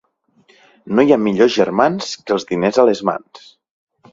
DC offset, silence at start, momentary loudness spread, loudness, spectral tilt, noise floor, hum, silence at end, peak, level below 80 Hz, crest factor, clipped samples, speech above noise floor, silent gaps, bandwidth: under 0.1%; 0.85 s; 8 LU; -16 LUFS; -5.5 dB/octave; -56 dBFS; none; 0.75 s; 0 dBFS; -58 dBFS; 18 dB; under 0.1%; 41 dB; none; 7.8 kHz